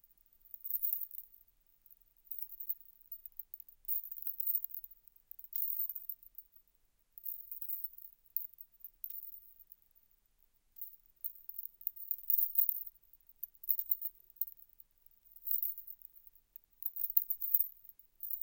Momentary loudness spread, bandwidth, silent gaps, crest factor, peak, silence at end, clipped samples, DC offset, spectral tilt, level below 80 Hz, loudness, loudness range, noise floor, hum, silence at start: 22 LU; 17 kHz; none; 34 dB; -8 dBFS; 0 s; under 0.1%; under 0.1%; -1 dB/octave; -76 dBFS; -36 LUFS; 10 LU; -73 dBFS; none; 0.45 s